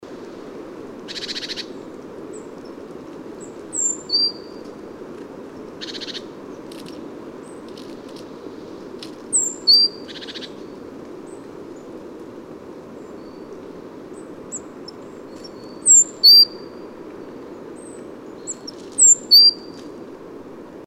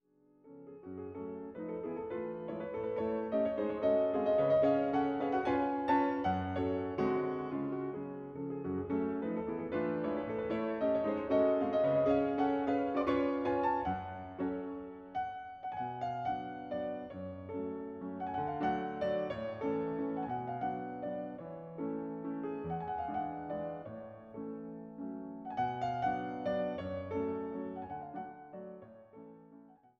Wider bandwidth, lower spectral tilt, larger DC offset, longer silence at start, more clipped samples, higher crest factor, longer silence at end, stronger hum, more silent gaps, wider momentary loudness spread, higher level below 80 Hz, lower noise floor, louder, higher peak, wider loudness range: first, 16 kHz vs 6.6 kHz; second, 0.5 dB/octave vs -8.5 dB/octave; neither; second, 0.1 s vs 0.45 s; neither; about the same, 18 dB vs 18 dB; second, 0.05 s vs 0.25 s; neither; neither; first, 26 LU vs 14 LU; about the same, -62 dBFS vs -64 dBFS; second, -37 dBFS vs -64 dBFS; first, -13 LUFS vs -36 LUFS; first, -4 dBFS vs -18 dBFS; first, 21 LU vs 9 LU